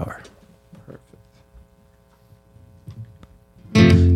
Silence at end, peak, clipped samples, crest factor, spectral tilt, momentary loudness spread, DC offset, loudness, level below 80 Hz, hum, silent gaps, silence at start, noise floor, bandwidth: 0 s; -2 dBFS; under 0.1%; 20 dB; -7 dB/octave; 30 LU; under 0.1%; -16 LUFS; -36 dBFS; none; none; 0 s; -55 dBFS; 10 kHz